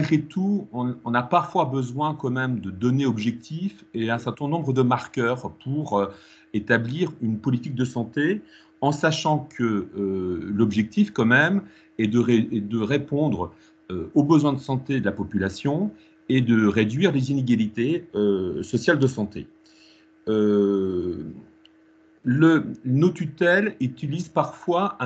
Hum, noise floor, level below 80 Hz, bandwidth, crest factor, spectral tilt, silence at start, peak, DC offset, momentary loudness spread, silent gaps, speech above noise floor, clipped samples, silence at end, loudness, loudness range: none; -56 dBFS; -60 dBFS; 8.2 kHz; 18 dB; -7 dB/octave; 0 s; -4 dBFS; under 0.1%; 11 LU; none; 33 dB; under 0.1%; 0 s; -23 LUFS; 3 LU